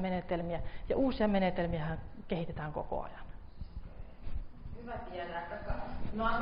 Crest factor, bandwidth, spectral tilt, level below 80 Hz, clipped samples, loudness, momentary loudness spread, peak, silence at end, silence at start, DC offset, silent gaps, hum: 16 dB; 5.4 kHz; -5.5 dB/octave; -44 dBFS; under 0.1%; -37 LUFS; 19 LU; -18 dBFS; 0 s; 0 s; under 0.1%; none; none